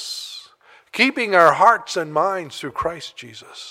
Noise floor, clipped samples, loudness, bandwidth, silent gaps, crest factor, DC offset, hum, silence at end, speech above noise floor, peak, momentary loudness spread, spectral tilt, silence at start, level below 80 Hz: -51 dBFS; under 0.1%; -18 LUFS; 16 kHz; none; 20 dB; under 0.1%; none; 0 s; 32 dB; -2 dBFS; 22 LU; -3.5 dB/octave; 0 s; -56 dBFS